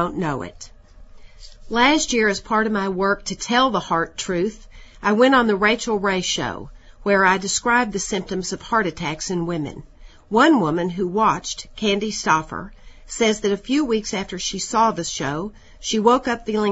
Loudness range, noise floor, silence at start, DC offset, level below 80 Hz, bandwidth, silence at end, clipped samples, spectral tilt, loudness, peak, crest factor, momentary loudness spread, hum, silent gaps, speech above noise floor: 3 LU; -43 dBFS; 0 s; under 0.1%; -44 dBFS; 8 kHz; 0 s; under 0.1%; -3.5 dB/octave; -20 LUFS; -2 dBFS; 20 dB; 12 LU; none; none; 22 dB